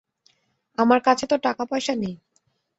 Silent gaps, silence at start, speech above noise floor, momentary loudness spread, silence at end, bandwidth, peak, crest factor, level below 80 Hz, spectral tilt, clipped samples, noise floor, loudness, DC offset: none; 0.8 s; 48 dB; 15 LU; 0.65 s; 8.2 kHz; -4 dBFS; 20 dB; -66 dBFS; -4.5 dB/octave; under 0.1%; -69 dBFS; -22 LUFS; under 0.1%